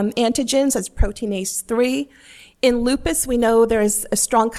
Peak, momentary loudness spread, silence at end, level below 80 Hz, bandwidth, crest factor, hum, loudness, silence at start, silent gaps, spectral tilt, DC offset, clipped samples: -4 dBFS; 8 LU; 0 s; -32 dBFS; 16 kHz; 14 dB; none; -19 LUFS; 0 s; none; -3.5 dB/octave; under 0.1%; under 0.1%